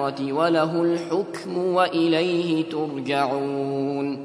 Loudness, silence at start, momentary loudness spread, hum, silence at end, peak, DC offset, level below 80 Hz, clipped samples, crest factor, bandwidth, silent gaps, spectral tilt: -23 LUFS; 0 s; 6 LU; none; 0 s; -6 dBFS; under 0.1%; -70 dBFS; under 0.1%; 16 dB; 11 kHz; none; -6.5 dB/octave